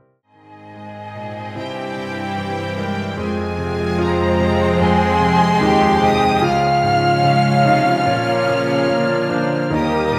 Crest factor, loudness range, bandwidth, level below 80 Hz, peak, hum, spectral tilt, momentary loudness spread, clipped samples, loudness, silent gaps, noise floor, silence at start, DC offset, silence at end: 14 dB; 10 LU; 13.5 kHz; -40 dBFS; -2 dBFS; none; -6.5 dB/octave; 13 LU; under 0.1%; -17 LUFS; none; -50 dBFS; 0.5 s; under 0.1%; 0 s